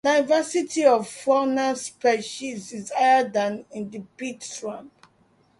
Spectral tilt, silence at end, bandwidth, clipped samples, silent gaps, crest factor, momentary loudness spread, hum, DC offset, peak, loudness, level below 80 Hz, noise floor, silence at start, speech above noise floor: -3.5 dB/octave; 0.75 s; 11.5 kHz; under 0.1%; none; 18 dB; 15 LU; none; under 0.1%; -4 dBFS; -23 LUFS; -72 dBFS; -62 dBFS; 0.05 s; 38 dB